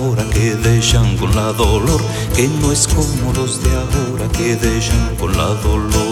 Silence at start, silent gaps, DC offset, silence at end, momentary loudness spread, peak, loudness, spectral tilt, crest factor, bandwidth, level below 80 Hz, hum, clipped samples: 0 s; none; under 0.1%; 0 s; 4 LU; -2 dBFS; -15 LUFS; -5 dB/octave; 14 dB; 16.5 kHz; -20 dBFS; none; under 0.1%